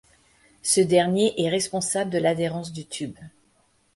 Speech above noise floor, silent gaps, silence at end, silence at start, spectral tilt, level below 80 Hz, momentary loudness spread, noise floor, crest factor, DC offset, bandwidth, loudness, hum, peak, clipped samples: 41 dB; none; 0.7 s; 0.65 s; -4 dB/octave; -62 dBFS; 14 LU; -64 dBFS; 18 dB; under 0.1%; 11.5 kHz; -23 LUFS; none; -6 dBFS; under 0.1%